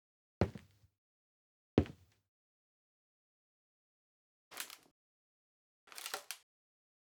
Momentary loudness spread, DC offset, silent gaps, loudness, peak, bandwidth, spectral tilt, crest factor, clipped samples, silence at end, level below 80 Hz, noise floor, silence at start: 18 LU; under 0.1%; 0.98-1.77 s, 2.28-4.51 s, 4.91-5.87 s; -41 LUFS; -14 dBFS; over 20 kHz; -5.5 dB/octave; 32 dB; under 0.1%; 0.7 s; -62 dBFS; -56 dBFS; 0.4 s